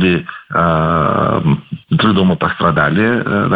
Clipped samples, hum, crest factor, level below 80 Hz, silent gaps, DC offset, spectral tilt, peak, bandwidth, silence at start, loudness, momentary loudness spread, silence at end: under 0.1%; none; 12 dB; -38 dBFS; none; under 0.1%; -9.5 dB/octave; 0 dBFS; 4.8 kHz; 0 s; -14 LUFS; 6 LU; 0 s